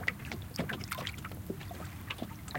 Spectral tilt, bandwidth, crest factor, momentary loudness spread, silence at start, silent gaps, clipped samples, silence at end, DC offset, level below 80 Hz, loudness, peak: -4.5 dB/octave; 17 kHz; 24 dB; 6 LU; 0 s; none; under 0.1%; 0 s; under 0.1%; -54 dBFS; -40 LUFS; -14 dBFS